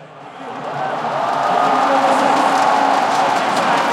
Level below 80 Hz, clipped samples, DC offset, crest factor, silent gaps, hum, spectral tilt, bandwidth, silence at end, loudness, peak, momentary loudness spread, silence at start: -70 dBFS; under 0.1%; under 0.1%; 14 dB; none; none; -3.5 dB/octave; 15.5 kHz; 0 s; -16 LUFS; -4 dBFS; 13 LU; 0 s